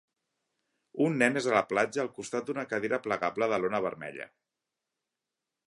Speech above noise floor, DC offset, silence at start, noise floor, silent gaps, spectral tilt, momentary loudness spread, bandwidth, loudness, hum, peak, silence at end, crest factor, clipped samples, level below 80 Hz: 58 dB; under 0.1%; 0.95 s; -88 dBFS; none; -5 dB/octave; 15 LU; 11.5 kHz; -30 LUFS; none; -10 dBFS; 1.4 s; 22 dB; under 0.1%; -74 dBFS